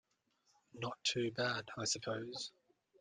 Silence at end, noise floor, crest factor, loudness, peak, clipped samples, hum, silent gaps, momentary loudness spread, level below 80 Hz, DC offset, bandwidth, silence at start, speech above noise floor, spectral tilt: 0.5 s; -79 dBFS; 20 dB; -40 LUFS; -22 dBFS; under 0.1%; none; none; 9 LU; -78 dBFS; under 0.1%; 10 kHz; 0.75 s; 39 dB; -3 dB/octave